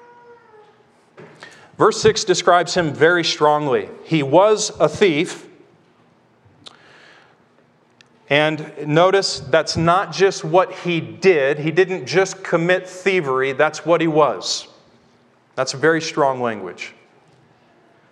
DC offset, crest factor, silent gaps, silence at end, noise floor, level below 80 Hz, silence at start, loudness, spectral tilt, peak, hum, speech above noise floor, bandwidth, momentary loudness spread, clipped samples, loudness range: under 0.1%; 18 dB; none; 1.2 s; -56 dBFS; -58 dBFS; 1.2 s; -17 LUFS; -4.5 dB/octave; 0 dBFS; none; 39 dB; 11 kHz; 9 LU; under 0.1%; 7 LU